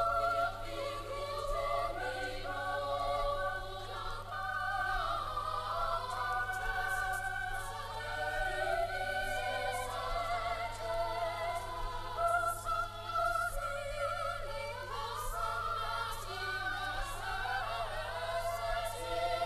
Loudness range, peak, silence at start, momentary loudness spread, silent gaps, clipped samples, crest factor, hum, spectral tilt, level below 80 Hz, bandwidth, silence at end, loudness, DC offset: 2 LU; -20 dBFS; 0 s; 6 LU; none; under 0.1%; 16 dB; none; -3 dB/octave; -46 dBFS; 14 kHz; 0 s; -36 LUFS; under 0.1%